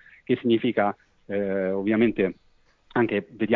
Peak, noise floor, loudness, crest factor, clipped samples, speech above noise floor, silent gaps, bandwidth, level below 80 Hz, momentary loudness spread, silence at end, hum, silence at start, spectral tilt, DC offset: -8 dBFS; -57 dBFS; -25 LUFS; 18 dB; under 0.1%; 33 dB; none; 4.3 kHz; -60 dBFS; 7 LU; 0 s; none; 0.3 s; -9.5 dB/octave; under 0.1%